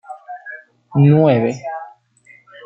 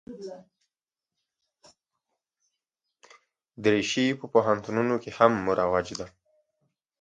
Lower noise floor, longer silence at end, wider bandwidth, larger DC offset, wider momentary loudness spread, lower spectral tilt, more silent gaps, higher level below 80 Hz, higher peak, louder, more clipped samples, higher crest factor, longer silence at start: second, -50 dBFS vs under -90 dBFS; second, 0.75 s vs 0.95 s; second, 7.2 kHz vs 9.2 kHz; neither; first, 23 LU vs 19 LU; first, -9 dB/octave vs -5 dB/octave; neither; about the same, -62 dBFS vs -62 dBFS; about the same, -2 dBFS vs -4 dBFS; first, -15 LUFS vs -25 LUFS; neither; second, 16 dB vs 26 dB; about the same, 0.1 s vs 0.1 s